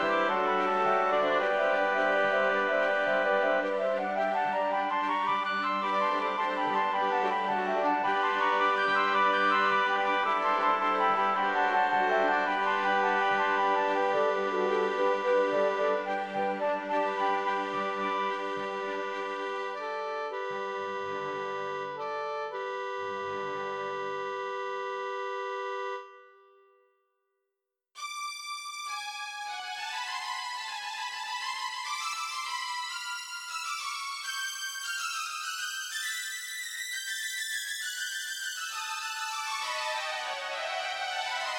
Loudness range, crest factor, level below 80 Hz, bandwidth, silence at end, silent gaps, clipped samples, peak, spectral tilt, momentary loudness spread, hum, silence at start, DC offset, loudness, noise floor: 10 LU; 16 dB; -80 dBFS; 19 kHz; 0 s; none; under 0.1%; -14 dBFS; -2 dB/octave; 9 LU; none; 0 s; under 0.1%; -30 LUFS; -86 dBFS